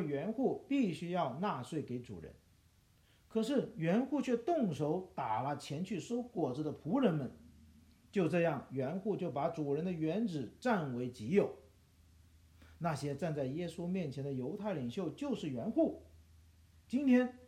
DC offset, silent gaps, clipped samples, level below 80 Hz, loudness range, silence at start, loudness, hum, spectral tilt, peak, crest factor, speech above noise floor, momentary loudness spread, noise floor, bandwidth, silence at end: under 0.1%; none; under 0.1%; -68 dBFS; 3 LU; 0 s; -37 LUFS; none; -7.5 dB/octave; -16 dBFS; 20 dB; 32 dB; 7 LU; -68 dBFS; 13.5 kHz; 0 s